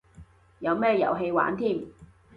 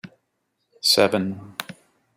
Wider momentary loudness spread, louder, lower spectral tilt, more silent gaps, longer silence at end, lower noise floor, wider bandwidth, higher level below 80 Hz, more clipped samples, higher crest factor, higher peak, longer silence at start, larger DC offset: second, 10 LU vs 18 LU; second, -26 LUFS vs -20 LUFS; first, -8 dB/octave vs -3 dB/octave; neither; second, 0.3 s vs 0.45 s; second, -52 dBFS vs -74 dBFS; second, 5.4 kHz vs 16.5 kHz; first, -60 dBFS vs -70 dBFS; neither; about the same, 18 dB vs 22 dB; second, -10 dBFS vs -2 dBFS; first, 0.2 s vs 0.05 s; neither